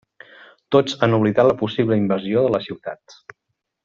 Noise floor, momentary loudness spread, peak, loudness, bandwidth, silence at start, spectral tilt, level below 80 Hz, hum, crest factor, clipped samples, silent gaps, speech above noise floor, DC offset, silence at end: -47 dBFS; 15 LU; -4 dBFS; -19 LUFS; 7.6 kHz; 0.7 s; -5.5 dB/octave; -58 dBFS; none; 18 dB; under 0.1%; none; 29 dB; under 0.1%; 0.9 s